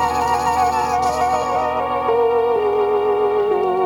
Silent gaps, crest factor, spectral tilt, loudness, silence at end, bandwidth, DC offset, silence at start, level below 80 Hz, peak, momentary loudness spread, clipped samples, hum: none; 12 dB; -4.5 dB/octave; -18 LUFS; 0 s; 17.5 kHz; under 0.1%; 0 s; -44 dBFS; -6 dBFS; 3 LU; under 0.1%; none